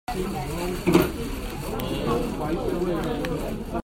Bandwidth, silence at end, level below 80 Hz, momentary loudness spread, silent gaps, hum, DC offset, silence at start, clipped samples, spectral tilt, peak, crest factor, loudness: 16.5 kHz; 0 s; -36 dBFS; 10 LU; none; none; under 0.1%; 0.1 s; under 0.1%; -6 dB/octave; -6 dBFS; 20 dB; -27 LUFS